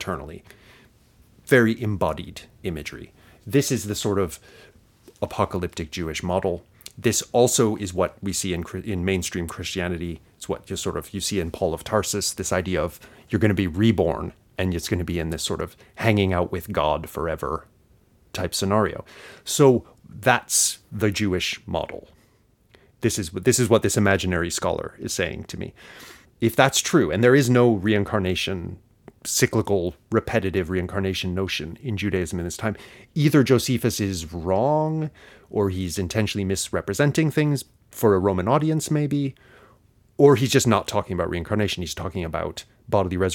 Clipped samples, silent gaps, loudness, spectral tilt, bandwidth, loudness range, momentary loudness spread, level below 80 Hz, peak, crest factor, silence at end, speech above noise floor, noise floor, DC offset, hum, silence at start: under 0.1%; none; -23 LUFS; -4.5 dB/octave; 18.5 kHz; 6 LU; 14 LU; -46 dBFS; 0 dBFS; 24 dB; 0 s; 37 dB; -60 dBFS; under 0.1%; none; 0 s